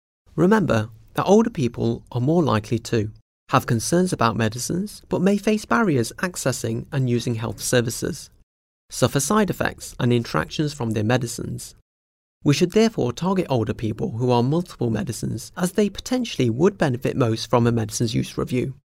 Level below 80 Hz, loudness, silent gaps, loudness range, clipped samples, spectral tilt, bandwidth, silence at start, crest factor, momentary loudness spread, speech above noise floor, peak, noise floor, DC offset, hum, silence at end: -48 dBFS; -22 LUFS; 3.22-3.47 s, 8.43-8.89 s, 11.82-12.41 s; 2 LU; under 0.1%; -5.5 dB/octave; 16 kHz; 0.35 s; 20 dB; 8 LU; over 69 dB; -2 dBFS; under -90 dBFS; under 0.1%; none; 0.15 s